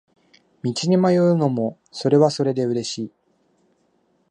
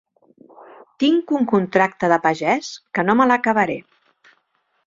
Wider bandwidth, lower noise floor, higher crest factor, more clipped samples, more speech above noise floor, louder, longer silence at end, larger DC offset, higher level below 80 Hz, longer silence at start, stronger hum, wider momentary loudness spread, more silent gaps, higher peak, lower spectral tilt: first, 10 kHz vs 7.6 kHz; about the same, -64 dBFS vs -67 dBFS; about the same, 18 dB vs 18 dB; neither; second, 45 dB vs 49 dB; about the same, -20 LUFS vs -18 LUFS; first, 1.2 s vs 1.05 s; neither; second, -68 dBFS vs -62 dBFS; second, 0.65 s vs 1 s; neither; first, 12 LU vs 7 LU; neither; about the same, -4 dBFS vs -2 dBFS; about the same, -6.5 dB/octave vs -5.5 dB/octave